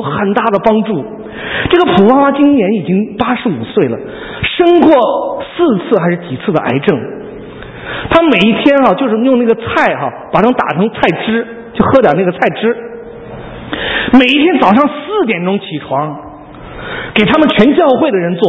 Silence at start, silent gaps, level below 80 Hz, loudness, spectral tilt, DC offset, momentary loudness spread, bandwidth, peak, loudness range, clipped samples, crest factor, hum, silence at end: 0 s; none; -40 dBFS; -11 LUFS; -8 dB/octave; under 0.1%; 17 LU; 8 kHz; 0 dBFS; 2 LU; 0.4%; 12 dB; none; 0 s